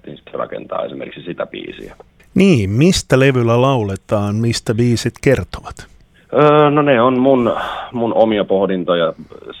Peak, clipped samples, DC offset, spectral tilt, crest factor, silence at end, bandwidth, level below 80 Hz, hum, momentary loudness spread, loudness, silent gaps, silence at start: 0 dBFS; under 0.1%; under 0.1%; -6 dB/octave; 16 dB; 0 s; 15.5 kHz; -42 dBFS; none; 17 LU; -15 LUFS; none; 0.05 s